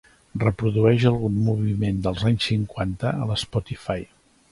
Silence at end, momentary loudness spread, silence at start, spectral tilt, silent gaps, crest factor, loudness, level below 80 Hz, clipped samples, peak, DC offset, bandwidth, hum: 0.5 s; 11 LU; 0.35 s; -7 dB/octave; none; 18 dB; -23 LUFS; -44 dBFS; under 0.1%; -4 dBFS; under 0.1%; 11.5 kHz; none